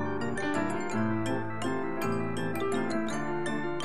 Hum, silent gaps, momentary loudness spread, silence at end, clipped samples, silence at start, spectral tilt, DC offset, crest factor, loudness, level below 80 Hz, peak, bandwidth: none; none; 2 LU; 0 s; under 0.1%; 0 s; -6 dB/octave; 1%; 14 dB; -32 LUFS; -58 dBFS; -18 dBFS; 13 kHz